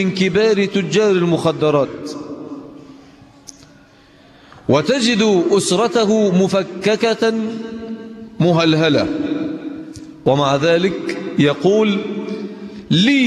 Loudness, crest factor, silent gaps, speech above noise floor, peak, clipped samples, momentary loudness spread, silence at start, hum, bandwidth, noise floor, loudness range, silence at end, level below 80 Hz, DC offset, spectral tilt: -16 LUFS; 14 dB; none; 32 dB; -2 dBFS; under 0.1%; 16 LU; 0 s; none; 12.5 kHz; -47 dBFS; 6 LU; 0 s; -54 dBFS; under 0.1%; -5.5 dB/octave